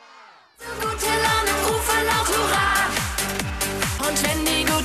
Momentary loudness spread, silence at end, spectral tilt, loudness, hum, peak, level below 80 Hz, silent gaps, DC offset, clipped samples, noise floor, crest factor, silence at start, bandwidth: 6 LU; 0 s; -2.5 dB/octave; -21 LUFS; none; -6 dBFS; -36 dBFS; none; under 0.1%; under 0.1%; -48 dBFS; 16 dB; 0.15 s; 14 kHz